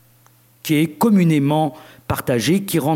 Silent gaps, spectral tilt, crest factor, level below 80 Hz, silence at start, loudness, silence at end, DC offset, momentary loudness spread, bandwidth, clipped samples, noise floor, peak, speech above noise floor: none; -6 dB/octave; 14 dB; -52 dBFS; 0.65 s; -18 LUFS; 0 s; under 0.1%; 11 LU; 17 kHz; under 0.1%; -53 dBFS; -4 dBFS; 36 dB